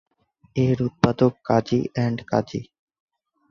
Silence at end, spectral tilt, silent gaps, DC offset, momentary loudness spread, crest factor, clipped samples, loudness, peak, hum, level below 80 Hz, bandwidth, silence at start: 0.9 s; -8 dB/octave; none; under 0.1%; 10 LU; 22 dB; under 0.1%; -23 LUFS; -2 dBFS; none; -52 dBFS; 7.2 kHz; 0.55 s